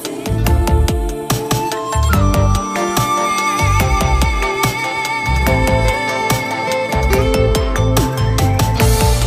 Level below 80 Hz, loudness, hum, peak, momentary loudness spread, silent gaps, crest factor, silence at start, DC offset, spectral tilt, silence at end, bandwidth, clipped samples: -20 dBFS; -15 LUFS; none; 0 dBFS; 4 LU; none; 14 dB; 0 s; under 0.1%; -5 dB/octave; 0 s; 15.5 kHz; under 0.1%